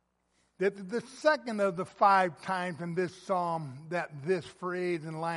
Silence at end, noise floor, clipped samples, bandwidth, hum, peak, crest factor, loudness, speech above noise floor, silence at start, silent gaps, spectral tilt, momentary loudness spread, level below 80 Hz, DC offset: 0 s; -74 dBFS; under 0.1%; 11.5 kHz; none; -10 dBFS; 20 dB; -31 LUFS; 43 dB; 0.6 s; none; -6 dB/octave; 11 LU; -76 dBFS; under 0.1%